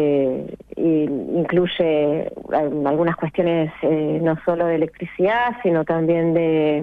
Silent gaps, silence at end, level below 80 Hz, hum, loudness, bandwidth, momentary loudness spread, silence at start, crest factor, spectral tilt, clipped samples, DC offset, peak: none; 0 s; -54 dBFS; none; -20 LUFS; 4.1 kHz; 5 LU; 0 s; 12 dB; -9.5 dB/octave; under 0.1%; under 0.1%; -8 dBFS